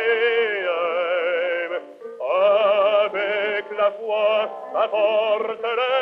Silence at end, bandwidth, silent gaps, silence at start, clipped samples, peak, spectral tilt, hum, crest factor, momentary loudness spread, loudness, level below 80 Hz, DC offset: 0 s; 5.6 kHz; none; 0 s; under 0.1%; -8 dBFS; -4.5 dB/octave; none; 14 dB; 8 LU; -21 LUFS; -74 dBFS; under 0.1%